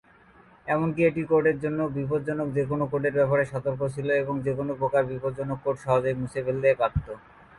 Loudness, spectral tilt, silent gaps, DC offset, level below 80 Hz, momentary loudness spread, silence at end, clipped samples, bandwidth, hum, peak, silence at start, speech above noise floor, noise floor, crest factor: -26 LUFS; -8.5 dB/octave; none; under 0.1%; -48 dBFS; 7 LU; 0.4 s; under 0.1%; 11.5 kHz; none; -10 dBFS; 0.65 s; 30 dB; -55 dBFS; 16 dB